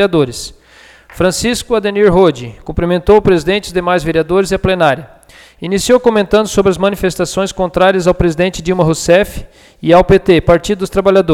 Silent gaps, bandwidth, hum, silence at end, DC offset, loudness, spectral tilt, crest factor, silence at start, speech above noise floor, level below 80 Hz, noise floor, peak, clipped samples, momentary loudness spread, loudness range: none; 16.5 kHz; none; 0 s; under 0.1%; -12 LUFS; -5.5 dB/octave; 12 dB; 0 s; 31 dB; -30 dBFS; -42 dBFS; 0 dBFS; under 0.1%; 9 LU; 2 LU